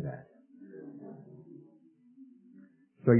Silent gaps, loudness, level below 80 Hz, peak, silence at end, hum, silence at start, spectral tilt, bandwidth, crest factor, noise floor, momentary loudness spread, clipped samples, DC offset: none; -44 LUFS; -74 dBFS; -12 dBFS; 0 s; none; 0 s; -7.5 dB/octave; 2.6 kHz; 22 dB; -61 dBFS; 17 LU; under 0.1%; under 0.1%